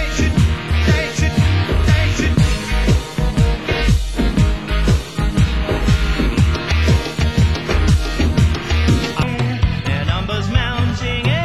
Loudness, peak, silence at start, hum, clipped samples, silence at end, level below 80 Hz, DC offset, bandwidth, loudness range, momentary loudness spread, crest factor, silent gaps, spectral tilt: -17 LUFS; -2 dBFS; 0 s; none; under 0.1%; 0 s; -20 dBFS; 0.8%; 12.5 kHz; 1 LU; 3 LU; 14 dB; none; -6 dB/octave